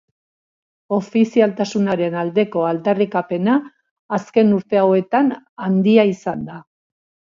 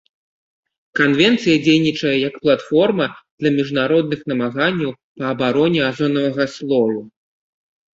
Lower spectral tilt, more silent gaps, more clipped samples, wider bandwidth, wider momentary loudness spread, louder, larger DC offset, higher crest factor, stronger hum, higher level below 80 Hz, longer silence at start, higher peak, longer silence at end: first, -7.5 dB/octave vs -6 dB/octave; first, 3.91-4.09 s, 5.49-5.56 s vs 3.31-3.38 s, 5.03-5.15 s; neither; about the same, 7.4 kHz vs 7.8 kHz; about the same, 10 LU vs 9 LU; about the same, -18 LUFS vs -18 LUFS; neither; about the same, 18 dB vs 16 dB; neither; second, -64 dBFS vs -58 dBFS; about the same, 0.9 s vs 0.95 s; about the same, 0 dBFS vs -2 dBFS; second, 0.7 s vs 0.85 s